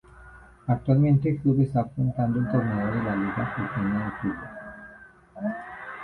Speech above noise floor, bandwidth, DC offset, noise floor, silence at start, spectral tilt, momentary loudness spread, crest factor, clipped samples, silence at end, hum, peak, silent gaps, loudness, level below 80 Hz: 25 dB; 4.3 kHz; under 0.1%; -50 dBFS; 0.15 s; -10.5 dB/octave; 16 LU; 18 dB; under 0.1%; 0 s; none; -8 dBFS; none; -26 LUFS; -52 dBFS